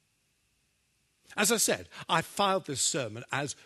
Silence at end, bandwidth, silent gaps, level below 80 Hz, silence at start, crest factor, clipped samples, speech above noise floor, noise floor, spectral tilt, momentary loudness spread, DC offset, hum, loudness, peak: 0.1 s; 13 kHz; none; -70 dBFS; 1.3 s; 22 dB; under 0.1%; 43 dB; -74 dBFS; -2 dB/octave; 9 LU; under 0.1%; 50 Hz at -70 dBFS; -29 LUFS; -10 dBFS